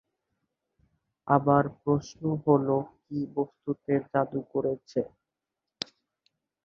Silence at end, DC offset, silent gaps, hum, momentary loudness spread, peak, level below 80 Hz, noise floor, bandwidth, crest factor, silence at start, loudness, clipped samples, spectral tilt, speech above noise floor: 1.6 s; under 0.1%; none; none; 15 LU; -6 dBFS; -64 dBFS; -87 dBFS; 7.6 kHz; 24 dB; 1.25 s; -28 LUFS; under 0.1%; -7.5 dB/octave; 60 dB